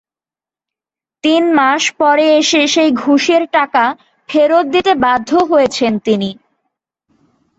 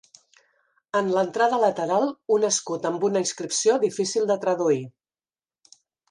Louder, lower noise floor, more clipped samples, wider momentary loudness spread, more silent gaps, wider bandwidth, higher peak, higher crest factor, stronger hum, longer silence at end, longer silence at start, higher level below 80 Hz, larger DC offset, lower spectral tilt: first, -12 LUFS vs -23 LUFS; about the same, under -90 dBFS vs under -90 dBFS; neither; about the same, 7 LU vs 5 LU; neither; second, 8 kHz vs 11.5 kHz; first, 0 dBFS vs -8 dBFS; about the same, 12 dB vs 16 dB; neither; about the same, 1.25 s vs 1.2 s; first, 1.25 s vs 0.95 s; first, -56 dBFS vs -74 dBFS; neither; about the same, -3.5 dB/octave vs -3.5 dB/octave